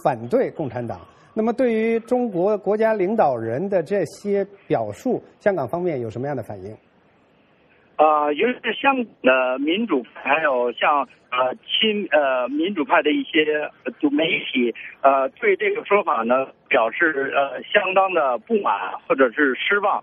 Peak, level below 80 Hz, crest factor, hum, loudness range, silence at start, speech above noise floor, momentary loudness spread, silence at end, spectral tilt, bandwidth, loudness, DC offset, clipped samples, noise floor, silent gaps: -2 dBFS; -66 dBFS; 18 dB; none; 4 LU; 0.05 s; 37 dB; 7 LU; 0 s; -6 dB/octave; 12 kHz; -21 LUFS; under 0.1%; under 0.1%; -57 dBFS; none